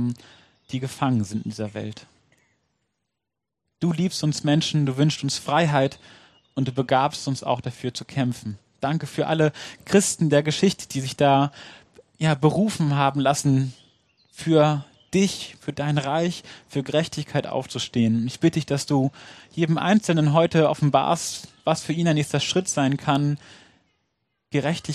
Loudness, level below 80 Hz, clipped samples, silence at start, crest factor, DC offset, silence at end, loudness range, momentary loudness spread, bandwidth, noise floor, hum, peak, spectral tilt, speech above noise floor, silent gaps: -23 LUFS; -62 dBFS; under 0.1%; 0 s; 20 dB; under 0.1%; 0 s; 5 LU; 12 LU; 13 kHz; -84 dBFS; none; -4 dBFS; -5.5 dB/octave; 62 dB; none